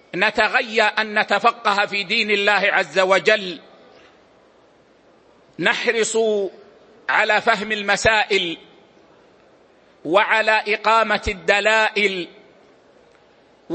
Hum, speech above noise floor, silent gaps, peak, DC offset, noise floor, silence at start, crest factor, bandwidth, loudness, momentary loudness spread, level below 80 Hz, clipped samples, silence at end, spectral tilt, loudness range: none; 35 dB; none; 0 dBFS; under 0.1%; -54 dBFS; 0.15 s; 20 dB; 8.8 kHz; -18 LUFS; 8 LU; -50 dBFS; under 0.1%; 0 s; -2.5 dB/octave; 5 LU